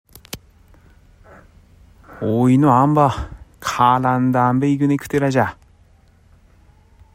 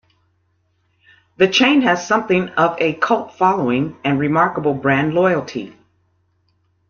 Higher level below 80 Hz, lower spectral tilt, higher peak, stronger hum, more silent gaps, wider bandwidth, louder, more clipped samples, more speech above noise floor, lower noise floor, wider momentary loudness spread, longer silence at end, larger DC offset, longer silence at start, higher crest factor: first, -44 dBFS vs -58 dBFS; first, -7 dB/octave vs -5.5 dB/octave; about the same, -2 dBFS vs -2 dBFS; neither; neither; first, 16 kHz vs 7.2 kHz; about the same, -17 LUFS vs -17 LUFS; neither; second, 36 dB vs 48 dB; second, -52 dBFS vs -64 dBFS; first, 21 LU vs 7 LU; first, 1.6 s vs 1.2 s; neither; second, 0.35 s vs 1.4 s; about the same, 18 dB vs 18 dB